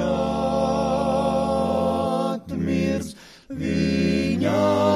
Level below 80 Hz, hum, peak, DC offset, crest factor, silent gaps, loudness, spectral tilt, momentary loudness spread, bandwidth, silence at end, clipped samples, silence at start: -42 dBFS; none; -8 dBFS; under 0.1%; 14 dB; none; -23 LUFS; -6.5 dB/octave; 6 LU; 14 kHz; 0 s; under 0.1%; 0 s